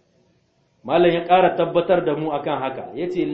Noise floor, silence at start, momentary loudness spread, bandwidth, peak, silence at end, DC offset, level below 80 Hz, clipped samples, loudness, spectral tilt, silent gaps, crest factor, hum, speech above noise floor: -63 dBFS; 0.85 s; 11 LU; 5.4 kHz; -2 dBFS; 0 s; under 0.1%; -54 dBFS; under 0.1%; -20 LUFS; -8.5 dB/octave; none; 18 dB; none; 44 dB